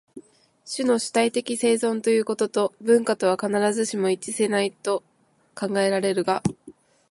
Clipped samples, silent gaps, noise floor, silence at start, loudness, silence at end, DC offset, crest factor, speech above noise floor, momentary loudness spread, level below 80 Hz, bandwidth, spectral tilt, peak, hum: under 0.1%; none; -50 dBFS; 0.15 s; -23 LUFS; 0.4 s; under 0.1%; 16 dB; 27 dB; 7 LU; -64 dBFS; 11.5 kHz; -4 dB/octave; -6 dBFS; none